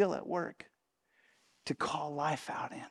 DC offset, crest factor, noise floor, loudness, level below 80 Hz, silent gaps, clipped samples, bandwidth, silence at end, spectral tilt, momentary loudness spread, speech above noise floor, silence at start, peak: under 0.1%; 22 dB; -76 dBFS; -37 LUFS; -76 dBFS; none; under 0.1%; 13.5 kHz; 0 s; -5 dB/octave; 13 LU; 41 dB; 0 s; -16 dBFS